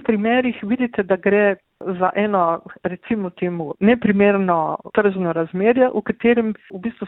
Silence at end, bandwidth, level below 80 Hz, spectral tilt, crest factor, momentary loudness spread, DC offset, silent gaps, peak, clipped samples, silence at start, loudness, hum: 0 s; 4 kHz; -54 dBFS; -11 dB/octave; 14 dB; 10 LU; under 0.1%; none; -4 dBFS; under 0.1%; 0.1 s; -19 LUFS; none